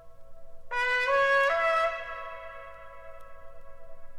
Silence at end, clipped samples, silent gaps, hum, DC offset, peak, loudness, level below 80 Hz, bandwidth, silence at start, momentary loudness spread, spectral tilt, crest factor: 0 s; under 0.1%; none; 50 Hz at -65 dBFS; 0.3%; -16 dBFS; -26 LUFS; -52 dBFS; 13.5 kHz; 0 s; 24 LU; -1.5 dB/octave; 14 dB